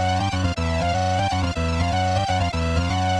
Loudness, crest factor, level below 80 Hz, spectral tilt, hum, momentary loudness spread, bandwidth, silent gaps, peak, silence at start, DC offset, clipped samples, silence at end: -22 LUFS; 12 dB; -32 dBFS; -5.5 dB/octave; none; 2 LU; 11 kHz; none; -10 dBFS; 0 s; under 0.1%; under 0.1%; 0 s